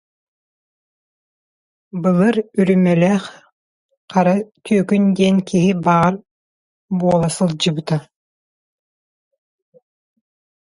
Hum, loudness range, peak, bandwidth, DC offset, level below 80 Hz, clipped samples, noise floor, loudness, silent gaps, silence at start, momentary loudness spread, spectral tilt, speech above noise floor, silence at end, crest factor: none; 5 LU; -2 dBFS; 11.5 kHz; under 0.1%; -56 dBFS; under 0.1%; under -90 dBFS; -17 LUFS; 3.53-3.89 s, 3.97-4.08 s, 6.31-6.88 s; 1.95 s; 8 LU; -6.5 dB/octave; over 74 dB; 2.6 s; 18 dB